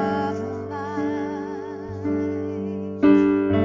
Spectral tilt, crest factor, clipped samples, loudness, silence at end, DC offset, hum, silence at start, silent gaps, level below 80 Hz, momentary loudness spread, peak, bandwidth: -8.5 dB/octave; 18 dB; under 0.1%; -24 LUFS; 0 s; under 0.1%; none; 0 s; none; -48 dBFS; 13 LU; -4 dBFS; 7.4 kHz